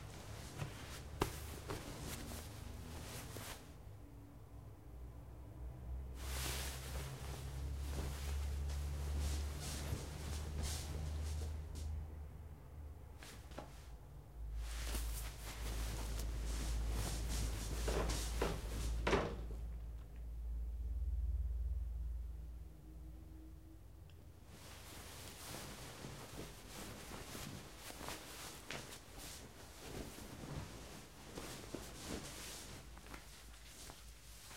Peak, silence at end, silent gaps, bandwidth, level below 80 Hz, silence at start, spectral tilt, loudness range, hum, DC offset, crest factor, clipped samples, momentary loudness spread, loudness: -18 dBFS; 0 s; none; 16 kHz; -46 dBFS; 0 s; -4.5 dB/octave; 10 LU; none; under 0.1%; 26 dB; under 0.1%; 14 LU; -47 LUFS